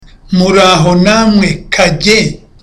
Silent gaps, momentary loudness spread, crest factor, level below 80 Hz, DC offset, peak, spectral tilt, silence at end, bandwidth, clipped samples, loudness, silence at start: none; 6 LU; 10 dB; -30 dBFS; under 0.1%; 0 dBFS; -5 dB/octave; 0.25 s; 13.5 kHz; under 0.1%; -8 LUFS; 0.3 s